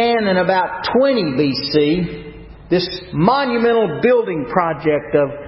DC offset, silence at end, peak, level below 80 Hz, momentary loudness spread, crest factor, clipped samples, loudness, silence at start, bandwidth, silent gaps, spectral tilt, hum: under 0.1%; 0 s; 0 dBFS; -44 dBFS; 5 LU; 16 dB; under 0.1%; -17 LUFS; 0 s; 5.8 kHz; none; -10 dB/octave; none